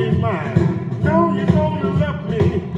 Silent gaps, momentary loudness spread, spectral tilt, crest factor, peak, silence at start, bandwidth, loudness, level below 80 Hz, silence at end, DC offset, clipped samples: none; 4 LU; -9 dB/octave; 16 dB; 0 dBFS; 0 s; 7.6 kHz; -18 LUFS; -42 dBFS; 0 s; under 0.1%; under 0.1%